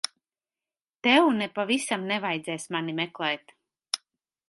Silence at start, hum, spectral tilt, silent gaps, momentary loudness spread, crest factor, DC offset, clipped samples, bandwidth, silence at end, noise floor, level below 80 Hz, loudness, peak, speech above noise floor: 1.05 s; none; -3.5 dB/octave; none; 13 LU; 22 dB; under 0.1%; under 0.1%; 11.5 kHz; 0.55 s; under -90 dBFS; -78 dBFS; -27 LUFS; -8 dBFS; over 64 dB